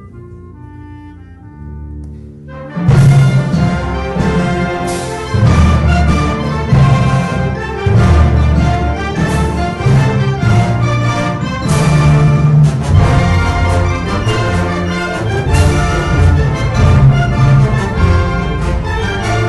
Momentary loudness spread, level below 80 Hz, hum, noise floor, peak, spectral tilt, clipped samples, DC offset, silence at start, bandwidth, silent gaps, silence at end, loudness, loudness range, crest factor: 9 LU; -20 dBFS; none; -33 dBFS; 0 dBFS; -7 dB/octave; under 0.1%; under 0.1%; 0 s; 12 kHz; none; 0 s; -12 LUFS; 2 LU; 12 dB